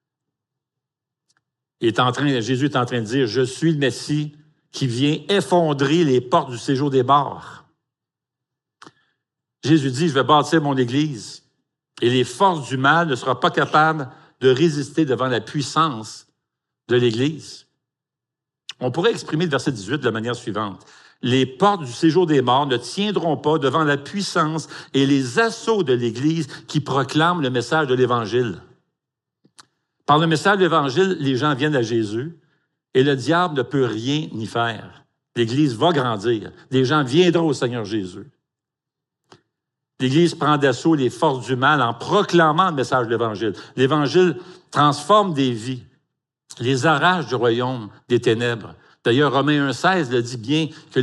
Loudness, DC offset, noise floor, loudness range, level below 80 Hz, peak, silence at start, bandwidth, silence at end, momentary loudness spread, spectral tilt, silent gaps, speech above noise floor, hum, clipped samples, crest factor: -19 LUFS; under 0.1%; -86 dBFS; 5 LU; -70 dBFS; -2 dBFS; 1.8 s; 12 kHz; 0 s; 10 LU; -5.5 dB/octave; none; 67 dB; none; under 0.1%; 18 dB